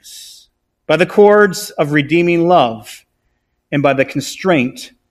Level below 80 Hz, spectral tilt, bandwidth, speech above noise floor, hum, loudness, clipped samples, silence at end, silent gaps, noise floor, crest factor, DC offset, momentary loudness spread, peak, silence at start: -54 dBFS; -5.5 dB/octave; 14.5 kHz; 53 dB; none; -13 LUFS; 0.1%; 0.25 s; none; -66 dBFS; 14 dB; under 0.1%; 16 LU; 0 dBFS; 0.05 s